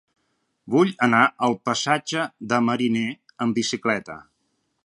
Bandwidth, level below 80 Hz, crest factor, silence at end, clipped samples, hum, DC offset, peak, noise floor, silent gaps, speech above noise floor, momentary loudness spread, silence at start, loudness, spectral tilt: 11.5 kHz; -68 dBFS; 20 dB; 0.6 s; under 0.1%; none; under 0.1%; -2 dBFS; -72 dBFS; none; 50 dB; 10 LU; 0.65 s; -22 LUFS; -4.5 dB/octave